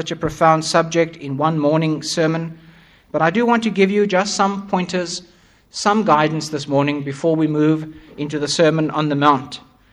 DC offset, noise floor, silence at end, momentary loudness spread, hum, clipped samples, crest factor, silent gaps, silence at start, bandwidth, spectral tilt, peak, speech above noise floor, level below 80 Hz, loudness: under 0.1%; -47 dBFS; 0.35 s; 11 LU; none; under 0.1%; 18 dB; none; 0 s; 12 kHz; -5 dB/octave; 0 dBFS; 30 dB; -54 dBFS; -18 LUFS